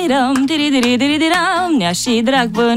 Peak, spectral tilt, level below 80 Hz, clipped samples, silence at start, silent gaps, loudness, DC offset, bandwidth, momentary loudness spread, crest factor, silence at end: -2 dBFS; -3.5 dB/octave; -48 dBFS; under 0.1%; 0 s; none; -14 LUFS; under 0.1%; 16 kHz; 2 LU; 12 dB; 0 s